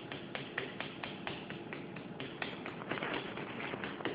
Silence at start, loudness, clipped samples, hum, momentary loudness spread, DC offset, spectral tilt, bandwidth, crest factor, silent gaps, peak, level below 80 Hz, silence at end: 0 s; -42 LUFS; under 0.1%; none; 6 LU; under 0.1%; -3 dB/octave; 7 kHz; 24 dB; none; -18 dBFS; -72 dBFS; 0 s